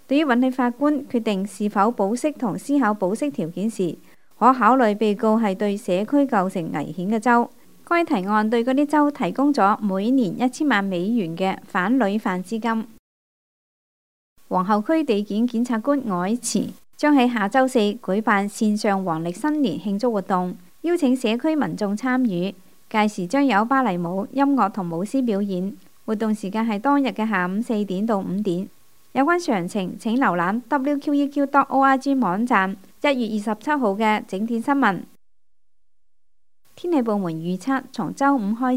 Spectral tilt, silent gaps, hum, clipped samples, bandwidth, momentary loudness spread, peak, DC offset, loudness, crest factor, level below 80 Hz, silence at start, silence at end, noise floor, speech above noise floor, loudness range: -6 dB/octave; 12.99-14.36 s; none; under 0.1%; 16 kHz; 8 LU; -2 dBFS; 0.4%; -21 LUFS; 20 dB; -70 dBFS; 0.1 s; 0 s; -79 dBFS; 58 dB; 5 LU